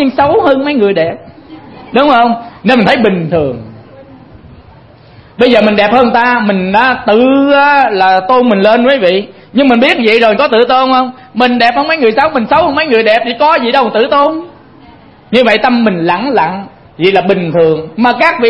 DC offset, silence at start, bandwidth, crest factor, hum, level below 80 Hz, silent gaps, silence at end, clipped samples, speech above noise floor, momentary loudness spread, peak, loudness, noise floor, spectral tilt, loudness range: under 0.1%; 0 s; 11 kHz; 10 dB; none; -44 dBFS; none; 0 s; 0.3%; 29 dB; 6 LU; 0 dBFS; -9 LUFS; -37 dBFS; -7 dB/octave; 4 LU